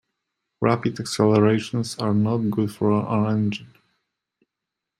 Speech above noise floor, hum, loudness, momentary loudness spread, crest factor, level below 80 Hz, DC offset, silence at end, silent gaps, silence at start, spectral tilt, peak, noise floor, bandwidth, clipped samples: 63 dB; none; -22 LUFS; 8 LU; 20 dB; -60 dBFS; under 0.1%; 1.35 s; none; 0.6 s; -6.5 dB/octave; -4 dBFS; -85 dBFS; 14 kHz; under 0.1%